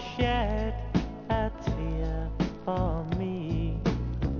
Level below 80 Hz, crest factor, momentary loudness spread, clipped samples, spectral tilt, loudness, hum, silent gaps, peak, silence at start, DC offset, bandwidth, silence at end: -34 dBFS; 16 dB; 4 LU; under 0.1%; -7.5 dB/octave; -31 LUFS; none; none; -12 dBFS; 0 s; under 0.1%; 7 kHz; 0 s